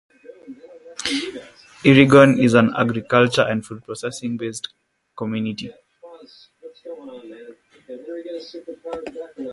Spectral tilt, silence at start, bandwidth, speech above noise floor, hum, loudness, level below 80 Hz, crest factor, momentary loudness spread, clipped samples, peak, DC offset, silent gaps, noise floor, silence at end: -6 dB/octave; 0.3 s; 11.5 kHz; 25 dB; none; -18 LUFS; -56 dBFS; 20 dB; 25 LU; under 0.1%; 0 dBFS; under 0.1%; none; -44 dBFS; 0 s